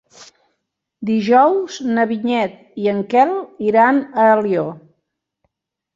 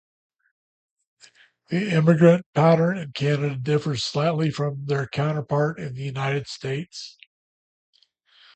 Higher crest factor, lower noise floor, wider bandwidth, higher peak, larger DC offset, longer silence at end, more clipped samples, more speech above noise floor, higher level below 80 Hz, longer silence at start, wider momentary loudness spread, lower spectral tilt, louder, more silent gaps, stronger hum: second, 16 dB vs 22 dB; first, -74 dBFS vs -59 dBFS; second, 7.6 kHz vs 8.6 kHz; about the same, -2 dBFS vs -2 dBFS; neither; second, 1.2 s vs 1.45 s; neither; first, 59 dB vs 37 dB; about the same, -64 dBFS vs -62 dBFS; second, 0.2 s vs 1.7 s; second, 9 LU vs 13 LU; about the same, -6 dB/octave vs -7 dB/octave; first, -16 LUFS vs -23 LUFS; second, none vs 2.46-2.53 s; neither